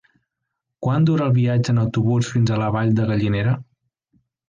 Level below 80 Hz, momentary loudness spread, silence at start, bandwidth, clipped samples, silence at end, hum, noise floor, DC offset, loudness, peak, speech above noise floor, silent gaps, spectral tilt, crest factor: -48 dBFS; 5 LU; 0.8 s; 7.6 kHz; under 0.1%; 0.85 s; none; -80 dBFS; under 0.1%; -20 LUFS; -10 dBFS; 62 dB; none; -7.5 dB/octave; 12 dB